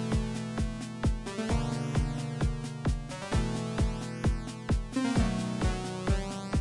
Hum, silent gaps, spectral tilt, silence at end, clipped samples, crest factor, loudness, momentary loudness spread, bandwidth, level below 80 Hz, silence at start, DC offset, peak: none; none; -6 dB/octave; 0 s; under 0.1%; 14 dB; -32 LUFS; 4 LU; 11.5 kHz; -36 dBFS; 0 s; under 0.1%; -16 dBFS